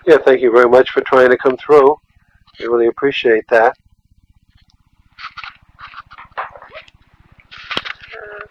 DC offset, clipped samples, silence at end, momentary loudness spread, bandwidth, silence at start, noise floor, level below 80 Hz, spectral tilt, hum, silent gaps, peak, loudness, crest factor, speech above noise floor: under 0.1%; under 0.1%; 0.05 s; 23 LU; 8.2 kHz; 0.05 s; -54 dBFS; -54 dBFS; -5.5 dB/octave; none; none; 0 dBFS; -13 LUFS; 16 dB; 43 dB